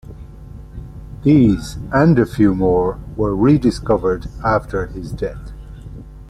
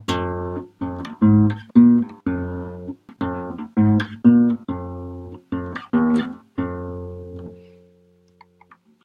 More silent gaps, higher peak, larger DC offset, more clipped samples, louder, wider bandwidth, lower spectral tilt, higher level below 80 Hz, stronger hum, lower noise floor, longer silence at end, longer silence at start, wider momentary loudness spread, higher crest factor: neither; about the same, -2 dBFS vs -2 dBFS; neither; neither; first, -17 LUFS vs -20 LUFS; first, 12.5 kHz vs 7.6 kHz; about the same, -8 dB/octave vs -8.5 dB/octave; first, -32 dBFS vs -48 dBFS; neither; second, -35 dBFS vs -56 dBFS; second, 0 s vs 1.45 s; about the same, 0.05 s vs 0 s; first, 23 LU vs 20 LU; about the same, 16 dB vs 20 dB